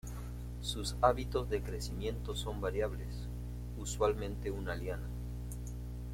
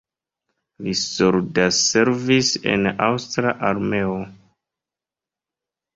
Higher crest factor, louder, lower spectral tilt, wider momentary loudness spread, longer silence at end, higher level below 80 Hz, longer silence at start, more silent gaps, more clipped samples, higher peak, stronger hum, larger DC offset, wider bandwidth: about the same, 24 dB vs 20 dB; second, -38 LUFS vs -19 LUFS; first, -5 dB/octave vs -3.5 dB/octave; first, 13 LU vs 9 LU; second, 0 s vs 1.6 s; first, -42 dBFS vs -54 dBFS; second, 0.05 s vs 0.8 s; neither; neither; second, -12 dBFS vs -2 dBFS; first, 60 Hz at -40 dBFS vs none; neither; first, 16.5 kHz vs 8 kHz